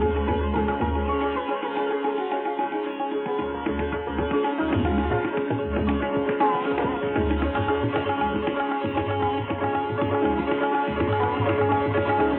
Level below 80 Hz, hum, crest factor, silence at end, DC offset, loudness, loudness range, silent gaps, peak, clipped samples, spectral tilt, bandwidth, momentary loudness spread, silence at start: -36 dBFS; none; 14 dB; 0 s; under 0.1%; -25 LUFS; 2 LU; none; -10 dBFS; under 0.1%; -10.5 dB/octave; 4.2 kHz; 5 LU; 0 s